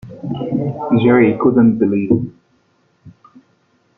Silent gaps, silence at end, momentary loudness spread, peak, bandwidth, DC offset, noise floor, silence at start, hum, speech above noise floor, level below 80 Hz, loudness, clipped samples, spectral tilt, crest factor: none; 0.9 s; 12 LU; -2 dBFS; 3.9 kHz; under 0.1%; -59 dBFS; 0.05 s; none; 46 dB; -52 dBFS; -15 LUFS; under 0.1%; -10.5 dB/octave; 14 dB